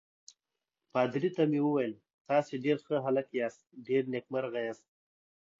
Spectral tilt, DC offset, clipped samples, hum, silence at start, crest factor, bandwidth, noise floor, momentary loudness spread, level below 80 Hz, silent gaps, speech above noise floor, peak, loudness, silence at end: -7 dB/octave; under 0.1%; under 0.1%; none; 0.95 s; 18 dB; 7.6 kHz; -89 dBFS; 9 LU; -82 dBFS; 2.14-2.25 s; 58 dB; -14 dBFS; -32 LUFS; 0.85 s